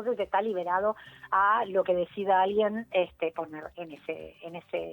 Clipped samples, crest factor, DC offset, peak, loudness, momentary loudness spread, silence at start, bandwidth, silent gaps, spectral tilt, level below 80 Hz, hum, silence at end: under 0.1%; 16 dB; under 0.1%; -14 dBFS; -28 LUFS; 16 LU; 0 s; 19 kHz; none; -7 dB/octave; -66 dBFS; none; 0 s